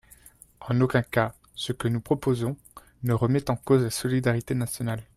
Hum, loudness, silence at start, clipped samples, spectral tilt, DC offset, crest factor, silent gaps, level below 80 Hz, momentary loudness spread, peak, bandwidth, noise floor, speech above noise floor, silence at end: none; -26 LUFS; 0.6 s; under 0.1%; -6 dB/octave; under 0.1%; 18 dB; none; -54 dBFS; 9 LU; -8 dBFS; 15 kHz; -53 dBFS; 28 dB; 0.15 s